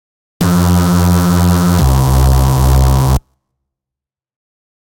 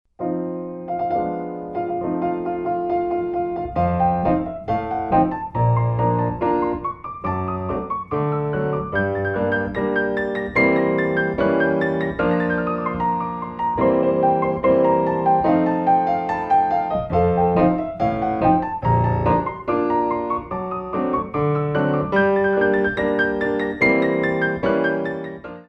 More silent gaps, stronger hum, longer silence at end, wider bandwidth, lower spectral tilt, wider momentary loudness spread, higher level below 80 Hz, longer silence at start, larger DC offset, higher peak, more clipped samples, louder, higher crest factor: neither; neither; first, 1.65 s vs 0.05 s; first, 17.5 kHz vs 6.8 kHz; second, -6.5 dB/octave vs -9.5 dB/octave; second, 4 LU vs 8 LU; first, -18 dBFS vs -44 dBFS; first, 0.4 s vs 0.2 s; neither; about the same, -2 dBFS vs -4 dBFS; neither; first, -11 LUFS vs -21 LUFS; second, 10 dB vs 16 dB